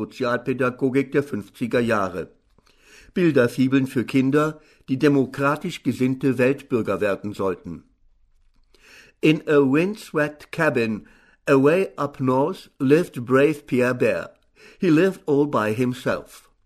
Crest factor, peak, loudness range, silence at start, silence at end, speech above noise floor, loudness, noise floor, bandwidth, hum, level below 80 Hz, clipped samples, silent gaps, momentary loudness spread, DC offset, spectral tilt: 18 dB; -4 dBFS; 4 LU; 0 s; 0.3 s; 37 dB; -22 LUFS; -58 dBFS; 13.5 kHz; none; -58 dBFS; under 0.1%; none; 11 LU; under 0.1%; -7 dB/octave